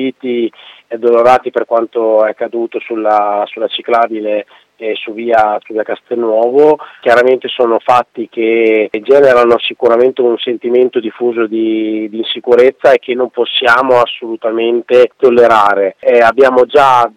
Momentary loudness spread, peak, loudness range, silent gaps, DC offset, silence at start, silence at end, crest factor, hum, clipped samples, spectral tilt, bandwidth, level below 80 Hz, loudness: 10 LU; 0 dBFS; 5 LU; none; under 0.1%; 0 s; 0.1 s; 10 dB; none; 0.8%; -5 dB/octave; 10 kHz; -54 dBFS; -11 LUFS